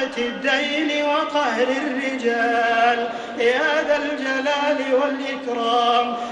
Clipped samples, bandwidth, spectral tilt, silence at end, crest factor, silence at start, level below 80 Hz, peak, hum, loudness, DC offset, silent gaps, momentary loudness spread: under 0.1%; 10 kHz; -2.5 dB/octave; 0 s; 16 dB; 0 s; -62 dBFS; -4 dBFS; none; -20 LUFS; under 0.1%; none; 6 LU